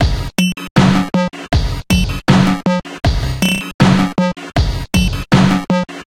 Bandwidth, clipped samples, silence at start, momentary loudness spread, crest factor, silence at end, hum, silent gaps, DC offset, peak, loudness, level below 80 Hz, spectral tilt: 16.5 kHz; under 0.1%; 0 s; 6 LU; 14 dB; 0.05 s; none; 0.71-0.75 s, 3.74-3.79 s; under 0.1%; 0 dBFS; -15 LUFS; -24 dBFS; -6 dB/octave